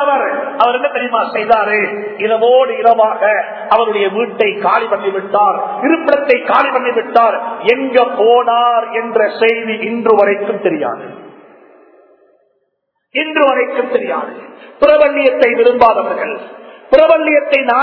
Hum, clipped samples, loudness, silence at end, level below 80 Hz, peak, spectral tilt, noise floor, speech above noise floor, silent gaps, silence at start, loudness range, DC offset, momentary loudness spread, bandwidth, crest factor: none; 0.3%; -12 LUFS; 0 s; -54 dBFS; 0 dBFS; -6.5 dB/octave; -67 dBFS; 55 dB; none; 0 s; 6 LU; under 0.1%; 8 LU; 5.4 kHz; 12 dB